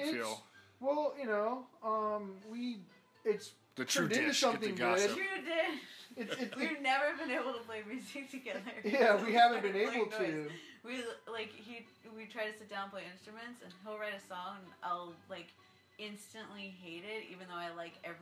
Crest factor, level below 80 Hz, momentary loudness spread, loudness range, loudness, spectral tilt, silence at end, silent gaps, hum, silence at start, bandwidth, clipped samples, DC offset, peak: 24 dB; under -90 dBFS; 19 LU; 12 LU; -36 LUFS; -3 dB/octave; 0 s; none; none; 0 s; 16 kHz; under 0.1%; under 0.1%; -14 dBFS